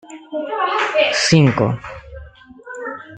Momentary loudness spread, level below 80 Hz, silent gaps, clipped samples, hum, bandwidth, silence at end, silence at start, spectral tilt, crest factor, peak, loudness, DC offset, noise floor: 20 LU; -46 dBFS; none; under 0.1%; none; 9.2 kHz; 0 s; 0.05 s; -5 dB/octave; 18 dB; -2 dBFS; -16 LUFS; under 0.1%; -40 dBFS